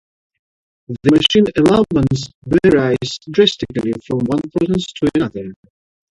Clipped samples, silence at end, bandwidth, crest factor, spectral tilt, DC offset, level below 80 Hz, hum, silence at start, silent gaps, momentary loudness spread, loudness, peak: under 0.1%; 0.6 s; 11.5 kHz; 16 dB; -6 dB/octave; under 0.1%; -44 dBFS; none; 0.9 s; 2.35-2.42 s; 9 LU; -16 LUFS; 0 dBFS